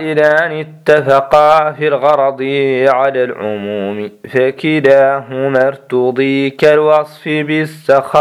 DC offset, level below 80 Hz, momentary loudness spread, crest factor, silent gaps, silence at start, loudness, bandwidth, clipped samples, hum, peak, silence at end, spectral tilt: under 0.1%; -54 dBFS; 10 LU; 12 dB; none; 0 s; -12 LUFS; 13 kHz; 0.3%; none; 0 dBFS; 0 s; -6.5 dB/octave